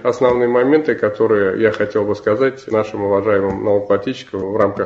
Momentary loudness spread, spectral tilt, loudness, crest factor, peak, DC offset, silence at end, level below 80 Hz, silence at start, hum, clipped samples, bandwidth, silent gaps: 5 LU; -7 dB/octave; -17 LUFS; 16 dB; 0 dBFS; under 0.1%; 0 s; -48 dBFS; 0 s; none; under 0.1%; 7.6 kHz; none